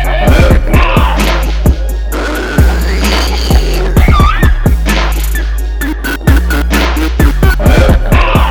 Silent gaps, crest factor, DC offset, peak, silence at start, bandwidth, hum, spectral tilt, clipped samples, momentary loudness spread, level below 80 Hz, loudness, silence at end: none; 8 dB; under 0.1%; 0 dBFS; 0 s; 19 kHz; none; -5.5 dB/octave; 1%; 7 LU; -10 dBFS; -11 LUFS; 0 s